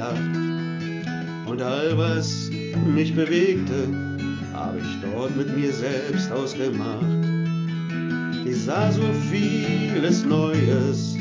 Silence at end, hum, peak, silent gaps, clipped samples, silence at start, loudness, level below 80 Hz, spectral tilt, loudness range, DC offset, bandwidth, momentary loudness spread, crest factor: 0 s; none; -8 dBFS; none; under 0.1%; 0 s; -24 LUFS; -52 dBFS; -6.5 dB/octave; 3 LU; under 0.1%; 7.6 kHz; 8 LU; 16 dB